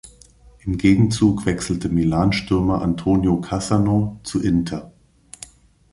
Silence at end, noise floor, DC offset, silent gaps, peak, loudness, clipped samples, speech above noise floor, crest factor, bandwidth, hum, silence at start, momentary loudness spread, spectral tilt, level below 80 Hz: 1.05 s; -49 dBFS; under 0.1%; none; -2 dBFS; -20 LUFS; under 0.1%; 30 dB; 16 dB; 11.5 kHz; none; 0.05 s; 16 LU; -6.5 dB/octave; -38 dBFS